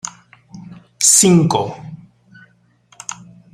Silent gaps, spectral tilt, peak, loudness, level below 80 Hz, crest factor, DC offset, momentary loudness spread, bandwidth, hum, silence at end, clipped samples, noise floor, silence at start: none; -3.5 dB/octave; 0 dBFS; -12 LUFS; -56 dBFS; 18 dB; under 0.1%; 26 LU; 16.5 kHz; none; 0.4 s; under 0.1%; -54 dBFS; 0.05 s